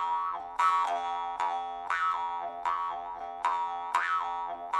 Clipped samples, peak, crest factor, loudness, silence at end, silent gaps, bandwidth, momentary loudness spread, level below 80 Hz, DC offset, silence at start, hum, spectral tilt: under 0.1%; -12 dBFS; 18 dB; -31 LUFS; 0 s; none; 12 kHz; 8 LU; -68 dBFS; under 0.1%; 0 s; none; -1 dB/octave